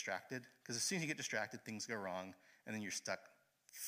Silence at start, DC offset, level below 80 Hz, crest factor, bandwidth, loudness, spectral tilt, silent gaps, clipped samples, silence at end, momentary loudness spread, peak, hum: 0 s; under 0.1%; under -90 dBFS; 20 dB; 15.5 kHz; -44 LUFS; -2.5 dB/octave; none; under 0.1%; 0 s; 11 LU; -26 dBFS; none